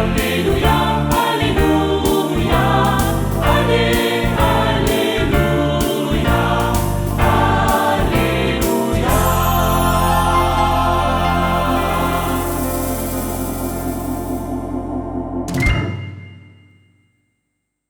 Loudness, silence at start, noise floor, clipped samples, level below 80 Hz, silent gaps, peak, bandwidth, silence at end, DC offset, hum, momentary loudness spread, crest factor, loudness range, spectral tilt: -17 LUFS; 0 s; -73 dBFS; under 0.1%; -26 dBFS; none; -2 dBFS; over 20 kHz; 1.5 s; under 0.1%; none; 8 LU; 14 dB; 7 LU; -5.5 dB/octave